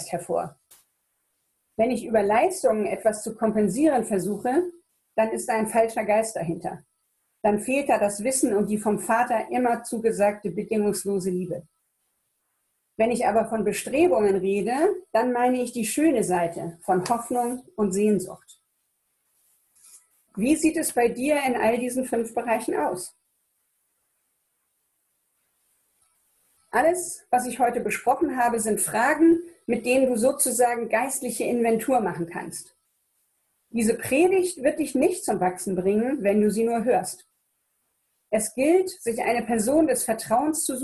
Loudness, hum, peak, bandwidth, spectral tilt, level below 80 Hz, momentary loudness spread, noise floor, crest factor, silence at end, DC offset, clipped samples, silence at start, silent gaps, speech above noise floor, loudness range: -24 LUFS; none; -8 dBFS; 14 kHz; -4.5 dB/octave; -60 dBFS; 8 LU; -74 dBFS; 16 dB; 0 s; under 0.1%; under 0.1%; 0 s; none; 51 dB; 5 LU